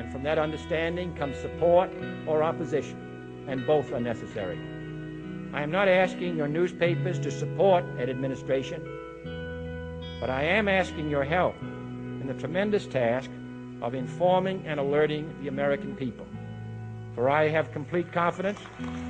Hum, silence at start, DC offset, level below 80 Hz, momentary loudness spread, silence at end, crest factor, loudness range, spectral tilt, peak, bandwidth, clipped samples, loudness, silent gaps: none; 0 s; under 0.1%; -52 dBFS; 15 LU; 0 s; 18 dB; 3 LU; -7 dB/octave; -10 dBFS; 9.2 kHz; under 0.1%; -28 LUFS; none